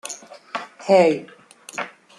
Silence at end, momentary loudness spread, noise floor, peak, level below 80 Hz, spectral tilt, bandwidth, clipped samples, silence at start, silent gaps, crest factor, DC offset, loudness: 0.3 s; 18 LU; -38 dBFS; -4 dBFS; -74 dBFS; -4.5 dB/octave; 12.5 kHz; under 0.1%; 0.05 s; none; 18 dB; under 0.1%; -20 LUFS